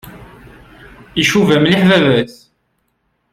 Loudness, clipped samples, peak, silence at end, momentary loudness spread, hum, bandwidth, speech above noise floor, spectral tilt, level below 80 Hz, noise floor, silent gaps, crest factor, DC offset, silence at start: -12 LUFS; under 0.1%; -2 dBFS; 1 s; 11 LU; none; 15.5 kHz; 54 dB; -5.5 dB/octave; -46 dBFS; -65 dBFS; none; 14 dB; under 0.1%; 0.05 s